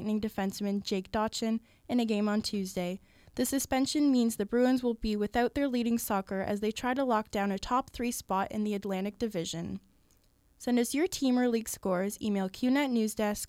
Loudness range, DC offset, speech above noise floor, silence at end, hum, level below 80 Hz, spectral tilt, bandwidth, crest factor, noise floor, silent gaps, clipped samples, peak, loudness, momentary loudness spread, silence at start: 4 LU; under 0.1%; 36 dB; 0 s; none; -56 dBFS; -4.5 dB/octave; 16.5 kHz; 16 dB; -66 dBFS; none; under 0.1%; -14 dBFS; -31 LUFS; 7 LU; 0 s